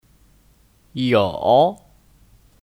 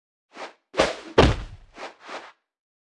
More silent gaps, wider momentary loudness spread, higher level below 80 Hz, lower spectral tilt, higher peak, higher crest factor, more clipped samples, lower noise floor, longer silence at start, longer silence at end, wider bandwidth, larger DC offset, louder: neither; second, 9 LU vs 21 LU; second, -54 dBFS vs -36 dBFS; first, -7 dB/octave vs -5.5 dB/octave; about the same, -4 dBFS vs -2 dBFS; second, 18 dB vs 24 dB; neither; first, -56 dBFS vs -42 dBFS; first, 0.95 s vs 0.35 s; first, 0.9 s vs 0.6 s; first, 15 kHz vs 11.5 kHz; neither; first, -18 LUFS vs -22 LUFS